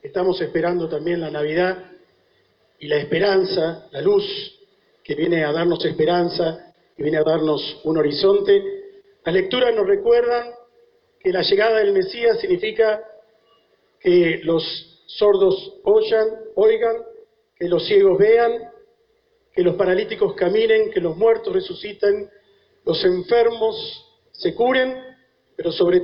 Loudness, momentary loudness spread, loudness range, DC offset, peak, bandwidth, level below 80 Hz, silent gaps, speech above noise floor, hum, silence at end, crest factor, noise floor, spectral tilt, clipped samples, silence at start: -19 LUFS; 13 LU; 3 LU; under 0.1%; -6 dBFS; 5.6 kHz; -56 dBFS; none; 45 dB; none; 0 s; 14 dB; -63 dBFS; -8.5 dB/octave; under 0.1%; 0.05 s